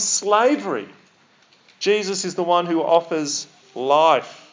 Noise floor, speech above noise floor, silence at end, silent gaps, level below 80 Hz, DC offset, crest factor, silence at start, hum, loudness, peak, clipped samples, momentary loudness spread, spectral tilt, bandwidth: -56 dBFS; 37 dB; 0.15 s; none; -86 dBFS; under 0.1%; 18 dB; 0 s; none; -20 LUFS; -2 dBFS; under 0.1%; 12 LU; -2.5 dB/octave; 7.8 kHz